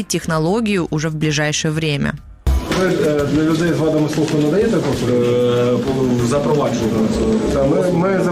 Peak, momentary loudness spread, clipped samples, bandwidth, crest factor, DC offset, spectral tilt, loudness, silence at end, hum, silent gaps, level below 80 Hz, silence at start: -8 dBFS; 4 LU; under 0.1%; 15.5 kHz; 8 dB; under 0.1%; -6 dB/octave; -17 LUFS; 0 s; none; none; -30 dBFS; 0 s